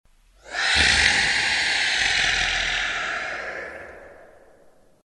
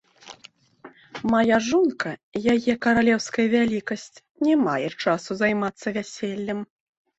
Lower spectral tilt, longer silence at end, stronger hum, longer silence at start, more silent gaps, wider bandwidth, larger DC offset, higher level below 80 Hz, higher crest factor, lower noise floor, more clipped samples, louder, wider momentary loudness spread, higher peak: second, -0.5 dB/octave vs -5 dB/octave; first, 0.8 s vs 0.55 s; neither; first, 0.45 s vs 0.25 s; second, none vs 2.23-2.32 s, 4.31-4.35 s; first, 11.5 kHz vs 8.2 kHz; neither; first, -42 dBFS vs -58 dBFS; first, 24 dB vs 16 dB; about the same, -54 dBFS vs -52 dBFS; neither; first, -20 LUFS vs -23 LUFS; first, 16 LU vs 13 LU; first, 0 dBFS vs -8 dBFS